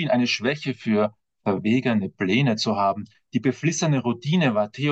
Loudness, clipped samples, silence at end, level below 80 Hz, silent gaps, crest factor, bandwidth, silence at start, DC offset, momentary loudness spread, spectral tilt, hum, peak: -23 LUFS; under 0.1%; 0 s; -70 dBFS; none; 14 dB; 8.4 kHz; 0 s; under 0.1%; 6 LU; -5.5 dB/octave; none; -8 dBFS